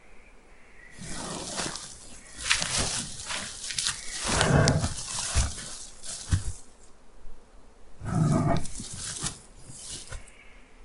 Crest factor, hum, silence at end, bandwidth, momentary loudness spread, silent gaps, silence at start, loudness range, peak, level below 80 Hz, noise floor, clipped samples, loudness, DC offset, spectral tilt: 30 dB; none; 0 s; 11.5 kHz; 19 LU; none; 0.05 s; 5 LU; 0 dBFS; -40 dBFS; -51 dBFS; under 0.1%; -29 LUFS; under 0.1%; -3.5 dB/octave